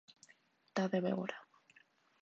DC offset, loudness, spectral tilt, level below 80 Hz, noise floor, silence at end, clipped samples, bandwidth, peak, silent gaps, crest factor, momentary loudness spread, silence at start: under 0.1%; -38 LUFS; -5.5 dB/octave; under -90 dBFS; -70 dBFS; 0.8 s; under 0.1%; 7.8 kHz; -22 dBFS; none; 20 dB; 11 LU; 0.75 s